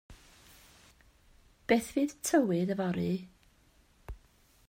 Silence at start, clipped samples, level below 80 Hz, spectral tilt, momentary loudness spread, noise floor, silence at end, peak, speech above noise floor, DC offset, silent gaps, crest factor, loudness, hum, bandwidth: 0.1 s; under 0.1%; -58 dBFS; -5.5 dB/octave; 23 LU; -65 dBFS; 0.55 s; -12 dBFS; 35 dB; under 0.1%; none; 22 dB; -31 LUFS; none; 16 kHz